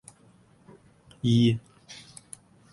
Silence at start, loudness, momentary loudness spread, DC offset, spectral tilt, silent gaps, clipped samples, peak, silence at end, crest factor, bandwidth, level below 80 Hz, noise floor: 1.25 s; -25 LUFS; 25 LU; under 0.1%; -6.5 dB/octave; none; under 0.1%; -12 dBFS; 0.8 s; 18 dB; 11.5 kHz; -60 dBFS; -58 dBFS